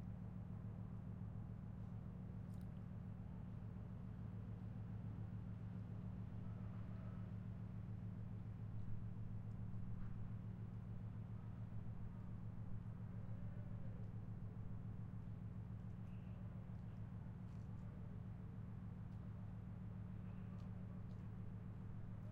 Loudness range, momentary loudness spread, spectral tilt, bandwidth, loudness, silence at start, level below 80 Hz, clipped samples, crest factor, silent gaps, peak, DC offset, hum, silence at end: 2 LU; 2 LU; -10 dB/octave; 4.3 kHz; -52 LUFS; 0 s; -60 dBFS; under 0.1%; 14 dB; none; -36 dBFS; under 0.1%; none; 0 s